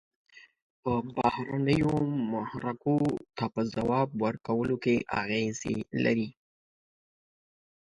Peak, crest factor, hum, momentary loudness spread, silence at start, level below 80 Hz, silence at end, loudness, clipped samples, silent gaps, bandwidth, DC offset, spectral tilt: -10 dBFS; 20 dB; none; 6 LU; 0.35 s; -58 dBFS; 1.5 s; -30 LUFS; under 0.1%; 0.62-0.83 s; 11 kHz; under 0.1%; -6.5 dB/octave